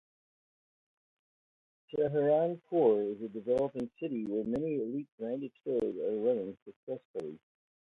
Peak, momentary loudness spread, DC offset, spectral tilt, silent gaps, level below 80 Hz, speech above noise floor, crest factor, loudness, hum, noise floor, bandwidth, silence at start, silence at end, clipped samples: -16 dBFS; 14 LU; under 0.1%; -9 dB/octave; 5.12-5.18 s, 6.62-6.66 s, 6.76-6.87 s, 7.05-7.14 s; -72 dBFS; over 57 dB; 18 dB; -33 LUFS; none; under -90 dBFS; 5.2 kHz; 1.9 s; 0.55 s; under 0.1%